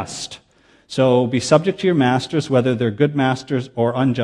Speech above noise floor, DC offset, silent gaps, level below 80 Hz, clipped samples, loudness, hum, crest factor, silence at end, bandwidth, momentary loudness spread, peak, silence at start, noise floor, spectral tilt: 33 dB; under 0.1%; none; -58 dBFS; under 0.1%; -18 LUFS; none; 18 dB; 0 s; 11.5 kHz; 10 LU; 0 dBFS; 0 s; -51 dBFS; -6 dB/octave